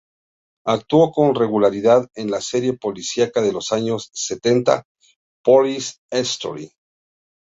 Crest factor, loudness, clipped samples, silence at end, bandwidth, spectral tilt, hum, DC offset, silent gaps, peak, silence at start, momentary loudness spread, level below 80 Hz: 18 dB; -19 LUFS; under 0.1%; 0.75 s; 8 kHz; -4.5 dB/octave; none; under 0.1%; 4.85-4.95 s, 5.16-5.44 s, 5.98-6.09 s; -2 dBFS; 0.65 s; 10 LU; -60 dBFS